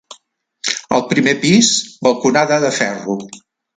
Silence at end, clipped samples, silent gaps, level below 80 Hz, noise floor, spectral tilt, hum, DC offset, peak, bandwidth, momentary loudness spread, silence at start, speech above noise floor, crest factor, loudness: 0.4 s; under 0.1%; none; -58 dBFS; -54 dBFS; -3.5 dB/octave; none; under 0.1%; 0 dBFS; 9.6 kHz; 13 LU; 0.1 s; 39 dB; 16 dB; -15 LUFS